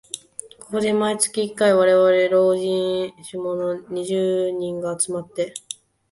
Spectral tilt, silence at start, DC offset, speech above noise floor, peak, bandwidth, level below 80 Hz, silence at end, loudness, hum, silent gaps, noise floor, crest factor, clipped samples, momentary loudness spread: -4 dB/octave; 0.15 s; under 0.1%; 20 dB; -6 dBFS; 11.5 kHz; -64 dBFS; 0.4 s; -21 LUFS; none; none; -40 dBFS; 16 dB; under 0.1%; 17 LU